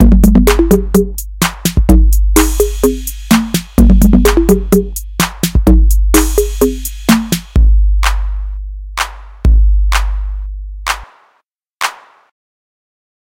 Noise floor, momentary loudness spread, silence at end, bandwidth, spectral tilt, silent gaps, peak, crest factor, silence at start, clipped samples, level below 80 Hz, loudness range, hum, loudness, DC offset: -60 dBFS; 13 LU; 1.3 s; 17 kHz; -5.5 dB/octave; 11.73-11.79 s; 0 dBFS; 10 dB; 0 s; 0.8%; -14 dBFS; 6 LU; none; -12 LUFS; under 0.1%